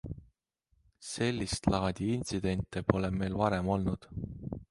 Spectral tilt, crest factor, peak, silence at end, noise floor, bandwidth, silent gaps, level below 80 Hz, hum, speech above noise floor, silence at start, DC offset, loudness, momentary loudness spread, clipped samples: -6 dB/octave; 24 dB; -8 dBFS; 0.05 s; -75 dBFS; 11.5 kHz; none; -48 dBFS; none; 43 dB; 0.05 s; under 0.1%; -33 LUFS; 12 LU; under 0.1%